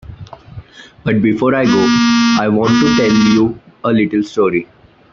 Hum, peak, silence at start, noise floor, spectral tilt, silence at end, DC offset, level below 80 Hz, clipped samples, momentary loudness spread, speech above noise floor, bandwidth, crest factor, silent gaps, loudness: none; 0 dBFS; 0.1 s; -34 dBFS; -5.5 dB/octave; 0.5 s; under 0.1%; -46 dBFS; under 0.1%; 10 LU; 22 dB; 7.4 kHz; 14 dB; none; -13 LUFS